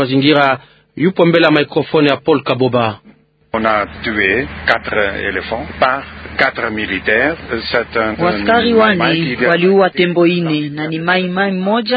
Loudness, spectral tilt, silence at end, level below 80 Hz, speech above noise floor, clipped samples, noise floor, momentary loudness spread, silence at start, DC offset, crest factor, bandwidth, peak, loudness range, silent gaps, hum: -14 LUFS; -8 dB/octave; 0 s; -42 dBFS; 30 dB; under 0.1%; -44 dBFS; 8 LU; 0 s; under 0.1%; 14 dB; 6.2 kHz; 0 dBFS; 3 LU; none; none